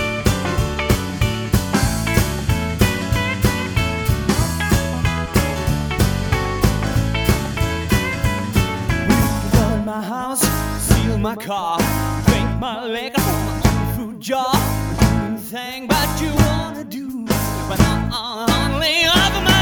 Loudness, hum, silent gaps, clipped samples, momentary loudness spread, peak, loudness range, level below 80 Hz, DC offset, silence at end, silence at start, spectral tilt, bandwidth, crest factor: -19 LUFS; none; none; under 0.1%; 6 LU; 0 dBFS; 1 LU; -26 dBFS; under 0.1%; 0 s; 0 s; -4.5 dB/octave; over 20 kHz; 18 dB